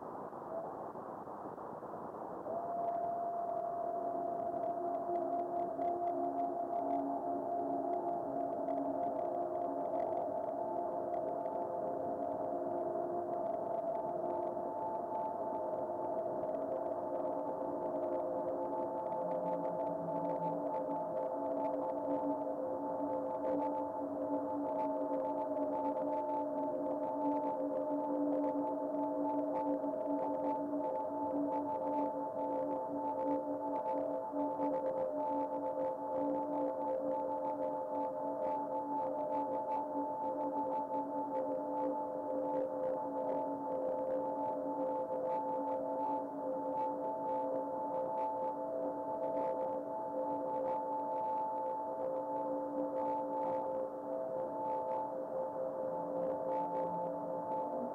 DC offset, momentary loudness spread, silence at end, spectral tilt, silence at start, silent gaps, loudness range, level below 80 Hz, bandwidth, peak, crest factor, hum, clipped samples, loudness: under 0.1%; 3 LU; 0 s; -9 dB/octave; 0 s; none; 2 LU; -78 dBFS; 5 kHz; -24 dBFS; 12 dB; none; under 0.1%; -38 LUFS